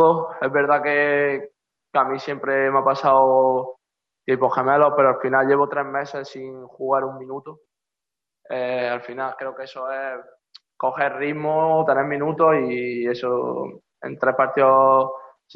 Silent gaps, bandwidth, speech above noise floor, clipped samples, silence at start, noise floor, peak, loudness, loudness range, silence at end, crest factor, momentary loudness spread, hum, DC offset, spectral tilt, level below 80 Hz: none; 6.4 kHz; 67 dB; under 0.1%; 0 s; -87 dBFS; -4 dBFS; -20 LUFS; 9 LU; 0.3 s; 16 dB; 15 LU; none; under 0.1%; -7.5 dB/octave; -72 dBFS